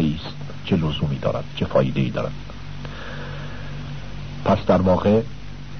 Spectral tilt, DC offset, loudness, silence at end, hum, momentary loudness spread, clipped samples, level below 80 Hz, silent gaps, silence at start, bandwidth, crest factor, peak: -8 dB/octave; 2%; -23 LUFS; 0 s; none; 17 LU; under 0.1%; -40 dBFS; none; 0 s; 6.6 kHz; 18 dB; -6 dBFS